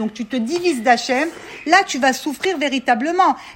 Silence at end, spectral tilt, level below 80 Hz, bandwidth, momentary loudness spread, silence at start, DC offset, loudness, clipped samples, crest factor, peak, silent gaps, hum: 0 s; -3 dB/octave; -60 dBFS; 16.5 kHz; 8 LU; 0 s; under 0.1%; -18 LUFS; under 0.1%; 18 dB; -2 dBFS; none; none